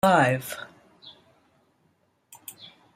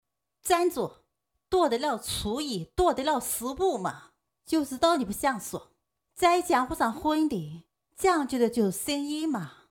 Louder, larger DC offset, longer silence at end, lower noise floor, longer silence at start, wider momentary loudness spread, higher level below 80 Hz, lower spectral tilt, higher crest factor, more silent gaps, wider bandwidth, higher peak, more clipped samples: first, -24 LUFS vs -27 LUFS; neither; about the same, 0.3 s vs 0.2 s; second, -68 dBFS vs -78 dBFS; second, 0.05 s vs 0.45 s; first, 28 LU vs 10 LU; second, -64 dBFS vs -52 dBFS; about the same, -5 dB/octave vs -4 dB/octave; about the same, 22 dB vs 20 dB; neither; second, 16 kHz vs 19.5 kHz; about the same, -6 dBFS vs -8 dBFS; neither